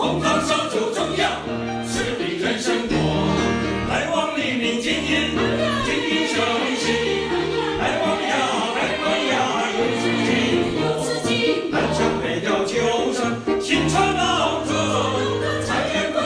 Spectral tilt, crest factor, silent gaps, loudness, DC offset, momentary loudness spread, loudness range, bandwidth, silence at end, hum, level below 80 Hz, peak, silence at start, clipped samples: -4 dB/octave; 14 dB; none; -21 LUFS; under 0.1%; 4 LU; 1 LU; 11 kHz; 0 s; none; -42 dBFS; -6 dBFS; 0 s; under 0.1%